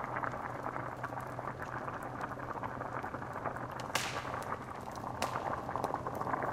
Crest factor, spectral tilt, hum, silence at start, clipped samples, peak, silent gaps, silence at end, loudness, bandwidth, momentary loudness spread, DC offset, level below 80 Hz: 22 dB; -4.5 dB/octave; none; 0 s; under 0.1%; -16 dBFS; none; 0 s; -39 LUFS; 16 kHz; 5 LU; under 0.1%; -60 dBFS